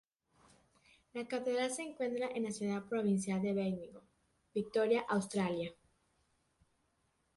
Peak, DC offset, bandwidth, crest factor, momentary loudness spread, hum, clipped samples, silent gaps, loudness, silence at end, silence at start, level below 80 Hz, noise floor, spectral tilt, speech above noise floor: -20 dBFS; under 0.1%; 11.5 kHz; 18 dB; 11 LU; none; under 0.1%; none; -37 LUFS; 1.65 s; 1.15 s; -74 dBFS; -78 dBFS; -5.5 dB/octave; 42 dB